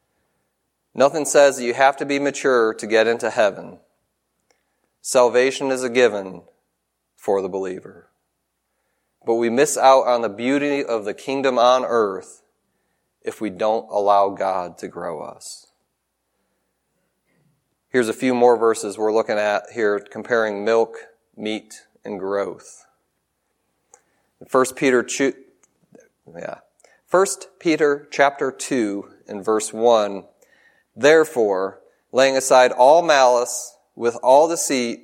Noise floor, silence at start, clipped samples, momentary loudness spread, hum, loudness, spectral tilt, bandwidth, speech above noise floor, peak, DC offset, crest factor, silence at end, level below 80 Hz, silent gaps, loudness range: -75 dBFS; 0.95 s; under 0.1%; 17 LU; none; -19 LUFS; -3 dB/octave; 16.5 kHz; 56 dB; 0 dBFS; under 0.1%; 20 dB; 0.05 s; -74 dBFS; none; 9 LU